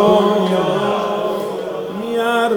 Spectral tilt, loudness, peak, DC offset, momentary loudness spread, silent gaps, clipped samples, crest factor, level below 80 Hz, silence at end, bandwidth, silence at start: -6 dB/octave; -18 LUFS; 0 dBFS; under 0.1%; 10 LU; none; under 0.1%; 16 dB; -54 dBFS; 0 s; over 20 kHz; 0 s